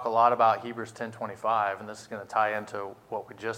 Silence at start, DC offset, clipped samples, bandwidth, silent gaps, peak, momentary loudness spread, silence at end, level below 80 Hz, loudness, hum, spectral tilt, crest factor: 0 s; under 0.1%; under 0.1%; 15.5 kHz; none; -8 dBFS; 15 LU; 0 s; -74 dBFS; -28 LUFS; none; -5 dB/octave; 20 dB